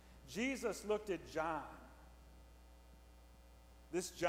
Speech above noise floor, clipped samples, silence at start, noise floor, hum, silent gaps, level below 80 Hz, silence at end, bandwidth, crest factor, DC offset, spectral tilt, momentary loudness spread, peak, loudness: 21 dB; under 0.1%; 0 s; -62 dBFS; none; none; -62 dBFS; 0 s; 18.5 kHz; 22 dB; under 0.1%; -4 dB/octave; 24 LU; -22 dBFS; -42 LUFS